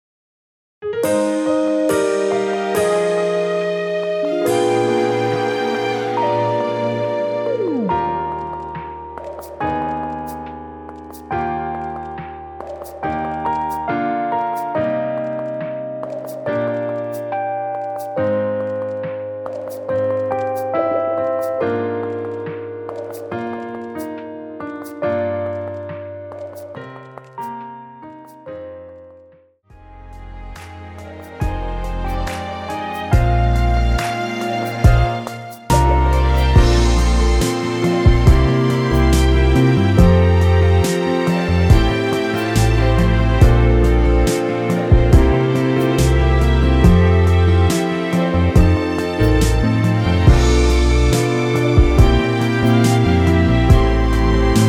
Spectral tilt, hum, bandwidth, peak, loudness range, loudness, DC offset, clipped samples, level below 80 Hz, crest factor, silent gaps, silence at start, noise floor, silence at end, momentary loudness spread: -6.5 dB/octave; none; 17 kHz; 0 dBFS; 13 LU; -17 LUFS; under 0.1%; under 0.1%; -22 dBFS; 16 dB; none; 0.8 s; -49 dBFS; 0 s; 17 LU